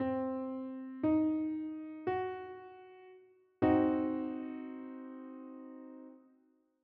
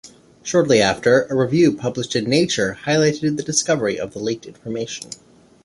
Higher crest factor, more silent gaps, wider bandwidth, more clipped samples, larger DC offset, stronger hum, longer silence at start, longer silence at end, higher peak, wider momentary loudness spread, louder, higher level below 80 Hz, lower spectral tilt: about the same, 20 dB vs 18 dB; neither; second, 4.1 kHz vs 11.5 kHz; neither; neither; neither; about the same, 0 s vs 0.05 s; first, 0.65 s vs 0.5 s; second, -16 dBFS vs -2 dBFS; first, 22 LU vs 14 LU; second, -35 LUFS vs -19 LUFS; second, -70 dBFS vs -54 dBFS; first, -7 dB/octave vs -4.5 dB/octave